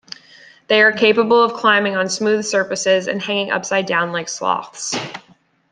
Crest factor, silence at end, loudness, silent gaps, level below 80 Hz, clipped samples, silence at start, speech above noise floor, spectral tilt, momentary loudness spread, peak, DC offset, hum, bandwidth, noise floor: 16 dB; 0.5 s; -17 LUFS; none; -66 dBFS; under 0.1%; 0.7 s; 29 dB; -3 dB/octave; 11 LU; -2 dBFS; under 0.1%; none; 10 kHz; -46 dBFS